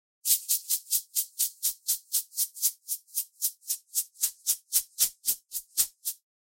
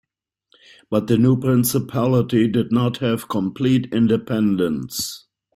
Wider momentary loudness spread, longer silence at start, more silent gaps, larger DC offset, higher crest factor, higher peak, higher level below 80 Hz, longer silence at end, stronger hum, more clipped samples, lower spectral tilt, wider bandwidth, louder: about the same, 6 LU vs 8 LU; second, 0.25 s vs 0.9 s; neither; neither; first, 24 dB vs 14 dB; second, -8 dBFS vs -4 dBFS; second, -70 dBFS vs -54 dBFS; about the same, 0.35 s vs 0.35 s; neither; neither; second, 4.5 dB/octave vs -6.5 dB/octave; about the same, 16.5 kHz vs 16 kHz; second, -28 LUFS vs -20 LUFS